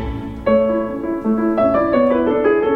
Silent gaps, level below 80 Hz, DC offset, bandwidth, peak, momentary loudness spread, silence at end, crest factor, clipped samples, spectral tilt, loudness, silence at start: none; -36 dBFS; under 0.1%; 5 kHz; -4 dBFS; 7 LU; 0 s; 12 dB; under 0.1%; -9 dB/octave; -17 LUFS; 0 s